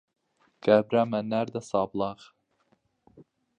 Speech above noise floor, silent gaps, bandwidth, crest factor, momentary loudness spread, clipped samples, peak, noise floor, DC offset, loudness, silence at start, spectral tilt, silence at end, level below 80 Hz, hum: 44 dB; none; 9.6 kHz; 22 dB; 11 LU; under 0.1%; -8 dBFS; -70 dBFS; under 0.1%; -27 LUFS; 0.65 s; -6.5 dB/octave; 1.45 s; -68 dBFS; none